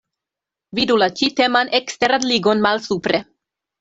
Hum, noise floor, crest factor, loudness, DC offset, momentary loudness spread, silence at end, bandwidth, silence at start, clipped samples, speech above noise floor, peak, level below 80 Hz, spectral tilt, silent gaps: none; -86 dBFS; 18 dB; -18 LUFS; under 0.1%; 6 LU; 0.6 s; 8 kHz; 0.75 s; under 0.1%; 69 dB; -2 dBFS; -58 dBFS; -3.5 dB/octave; none